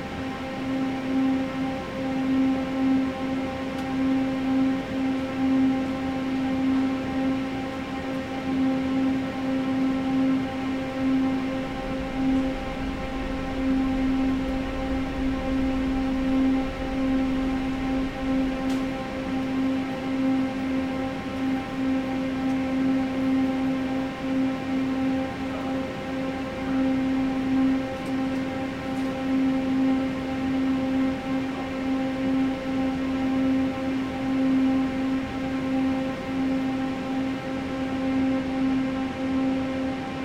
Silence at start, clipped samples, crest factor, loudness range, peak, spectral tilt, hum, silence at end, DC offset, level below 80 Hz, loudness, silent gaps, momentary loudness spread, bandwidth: 0 s; under 0.1%; 12 dB; 2 LU; -14 dBFS; -6.5 dB/octave; none; 0 s; under 0.1%; -42 dBFS; -26 LUFS; none; 6 LU; 9.2 kHz